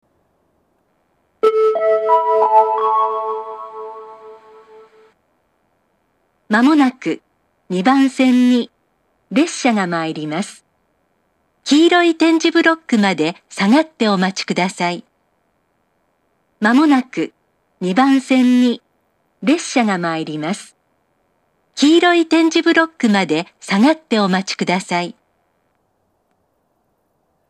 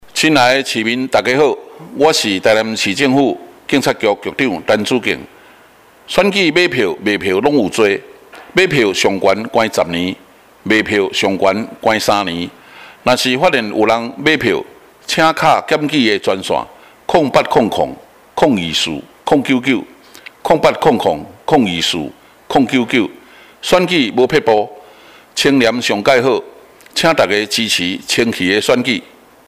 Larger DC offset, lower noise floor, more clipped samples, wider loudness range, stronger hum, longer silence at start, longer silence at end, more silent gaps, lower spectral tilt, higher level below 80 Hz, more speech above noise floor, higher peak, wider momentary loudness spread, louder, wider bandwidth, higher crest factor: neither; first, -65 dBFS vs -45 dBFS; neither; first, 6 LU vs 2 LU; neither; first, 1.45 s vs 0.05 s; first, 2.4 s vs 0.45 s; neither; about the same, -5 dB/octave vs -4 dB/octave; second, -74 dBFS vs -48 dBFS; first, 50 dB vs 31 dB; about the same, 0 dBFS vs -2 dBFS; first, 13 LU vs 9 LU; about the same, -15 LUFS vs -14 LUFS; second, 11.5 kHz vs 16 kHz; about the same, 18 dB vs 14 dB